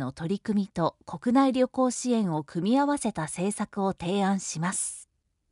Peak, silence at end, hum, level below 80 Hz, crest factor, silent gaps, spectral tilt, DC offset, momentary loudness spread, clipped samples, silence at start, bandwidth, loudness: -10 dBFS; 0.5 s; none; -62 dBFS; 18 dB; none; -5 dB/octave; under 0.1%; 7 LU; under 0.1%; 0 s; 11.5 kHz; -27 LUFS